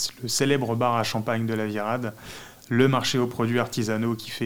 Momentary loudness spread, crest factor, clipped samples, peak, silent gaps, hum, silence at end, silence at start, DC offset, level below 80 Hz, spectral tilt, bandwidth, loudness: 9 LU; 20 dB; under 0.1%; -6 dBFS; none; none; 0 s; 0 s; 0.5%; -60 dBFS; -5 dB/octave; 18 kHz; -25 LUFS